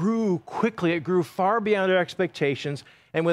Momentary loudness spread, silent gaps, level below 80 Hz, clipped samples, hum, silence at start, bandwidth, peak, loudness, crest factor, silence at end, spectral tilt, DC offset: 9 LU; none; -68 dBFS; under 0.1%; none; 0 s; 13.5 kHz; -8 dBFS; -25 LUFS; 16 dB; 0 s; -6.5 dB/octave; under 0.1%